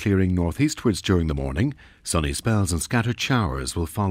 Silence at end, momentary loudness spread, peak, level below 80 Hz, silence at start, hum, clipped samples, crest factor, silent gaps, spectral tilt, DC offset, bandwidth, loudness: 0 s; 5 LU; -8 dBFS; -36 dBFS; 0 s; none; under 0.1%; 16 dB; none; -5.5 dB/octave; under 0.1%; 16 kHz; -23 LUFS